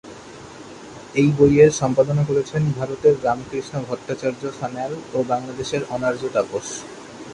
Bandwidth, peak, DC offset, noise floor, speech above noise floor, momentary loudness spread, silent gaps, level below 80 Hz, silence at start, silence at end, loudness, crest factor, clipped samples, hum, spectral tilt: 11 kHz; -2 dBFS; under 0.1%; -39 dBFS; 19 dB; 23 LU; none; -50 dBFS; 0.05 s; 0 s; -21 LUFS; 18 dB; under 0.1%; none; -6.5 dB/octave